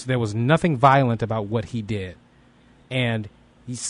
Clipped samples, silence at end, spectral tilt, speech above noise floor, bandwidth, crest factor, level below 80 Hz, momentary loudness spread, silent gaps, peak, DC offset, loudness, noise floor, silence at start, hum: under 0.1%; 0 s; -6 dB/octave; 33 dB; 11 kHz; 20 dB; -52 dBFS; 15 LU; none; -4 dBFS; under 0.1%; -22 LUFS; -54 dBFS; 0 s; none